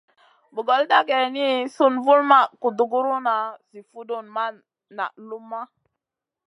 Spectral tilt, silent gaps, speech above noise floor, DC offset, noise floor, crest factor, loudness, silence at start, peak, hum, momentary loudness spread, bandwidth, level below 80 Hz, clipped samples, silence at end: -4 dB/octave; none; 64 dB; under 0.1%; -86 dBFS; 22 dB; -21 LUFS; 0.55 s; -2 dBFS; none; 18 LU; 11 kHz; -84 dBFS; under 0.1%; 0.8 s